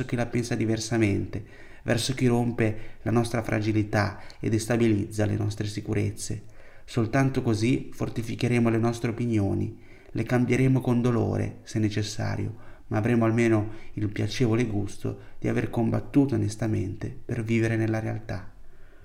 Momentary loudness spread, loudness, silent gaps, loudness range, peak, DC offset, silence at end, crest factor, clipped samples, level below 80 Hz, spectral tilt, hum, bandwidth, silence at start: 11 LU; -27 LUFS; none; 2 LU; -10 dBFS; under 0.1%; 0 s; 16 dB; under 0.1%; -46 dBFS; -6.5 dB/octave; none; 15.5 kHz; 0 s